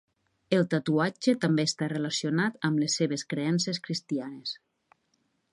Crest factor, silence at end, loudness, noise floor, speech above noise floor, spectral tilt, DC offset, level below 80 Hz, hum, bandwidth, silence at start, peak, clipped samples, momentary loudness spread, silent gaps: 18 dB; 1 s; -28 LUFS; -74 dBFS; 46 dB; -5 dB/octave; under 0.1%; -74 dBFS; none; 11.5 kHz; 0.5 s; -12 dBFS; under 0.1%; 8 LU; none